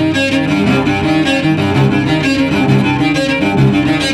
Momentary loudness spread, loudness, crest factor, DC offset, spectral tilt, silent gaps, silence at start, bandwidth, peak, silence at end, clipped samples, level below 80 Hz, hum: 2 LU; -12 LUFS; 10 dB; under 0.1%; -6 dB/octave; none; 0 s; 12.5 kHz; -2 dBFS; 0 s; under 0.1%; -36 dBFS; none